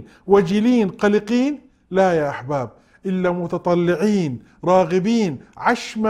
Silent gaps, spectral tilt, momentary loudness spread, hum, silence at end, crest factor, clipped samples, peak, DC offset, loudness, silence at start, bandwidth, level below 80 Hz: none; -6.5 dB/octave; 9 LU; none; 0 s; 18 dB; under 0.1%; -2 dBFS; under 0.1%; -19 LUFS; 0 s; 12 kHz; -54 dBFS